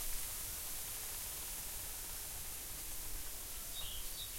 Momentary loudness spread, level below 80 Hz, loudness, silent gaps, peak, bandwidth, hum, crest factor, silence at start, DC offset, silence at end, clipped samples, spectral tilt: 3 LU; -52 dBFS; -42 LUFS; none; -28 dBFS; 16.5 kHz; none; 16 dB; 0 s; under 0.1%; 0 s; under 0.1%; -0.5 dB/octave